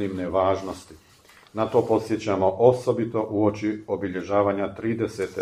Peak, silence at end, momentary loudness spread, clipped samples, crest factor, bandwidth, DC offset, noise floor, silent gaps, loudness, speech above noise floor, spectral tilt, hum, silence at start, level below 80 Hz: -4 dBFS; 0 s; 10 LU; under 0.1%; 20 dB; 13.5 kHz; under 0.1%; -53 dBFS; none; -24 LUFS; 30 dB; -7 dB/octave; none; 0 s; -58 dBFS